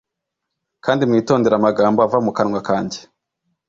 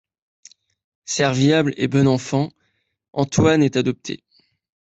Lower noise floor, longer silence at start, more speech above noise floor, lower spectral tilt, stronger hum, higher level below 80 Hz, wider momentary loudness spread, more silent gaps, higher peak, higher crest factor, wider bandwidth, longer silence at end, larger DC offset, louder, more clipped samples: first, -80 dBFS vs -69 dBFS; second, 0.85 s vs 1.1 s; first, 63 dB vs 51 dB; about the same, -6.5 dB/octave vs -5.5 dB/octave; neither; about the same, -56 dBFS vs -54 dBFS; second, 9 LU vs 14 LU; neither; about the same, -2 dBFS vs -4 dBFS; about the same, 16 dB vs 18 dB; about the same, 7.8 kHz vs 8.2 kHz; about the same, 0.7 s vs 0.8 s; neither; about the same, -17 LUFS vs -19 LUFS; neither